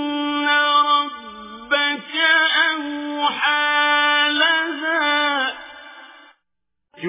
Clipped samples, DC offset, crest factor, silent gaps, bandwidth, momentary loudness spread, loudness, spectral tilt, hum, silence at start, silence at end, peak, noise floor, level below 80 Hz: under 0.1%; under 0.1%; 16 dB; none; 3.9 kHz; 12 LU; -17 LUFS; -5.5 dB/octave; none; 0 s; 0 s; -4 dBFS; -81 dBFS; -66 dBFS